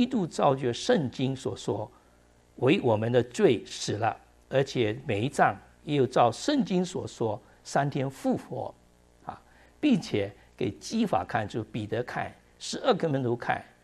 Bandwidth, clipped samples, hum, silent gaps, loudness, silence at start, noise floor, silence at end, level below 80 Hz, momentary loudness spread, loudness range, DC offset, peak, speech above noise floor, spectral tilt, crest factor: 13 kHz; under 0.1%; none; none; -28 LUFS; 0 s; -60 dBFS; 0.2 s; -62 dBFS; 13 LU; 4 LU; under 0.1%; -8 dBFS; 33 dB; -6 dB/octave; 20 dB